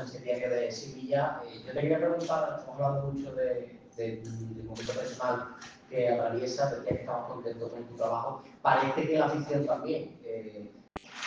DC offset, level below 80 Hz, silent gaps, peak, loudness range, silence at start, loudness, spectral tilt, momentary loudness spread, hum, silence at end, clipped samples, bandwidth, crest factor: under 0.1%; -64 dBFS; none; -10 dBFS; 4 LU; 0 s; -32 LUFS; -6 dB/octave; 13 LU; none; 0 s; under 0.1%; 7.8 kHz; 22 dB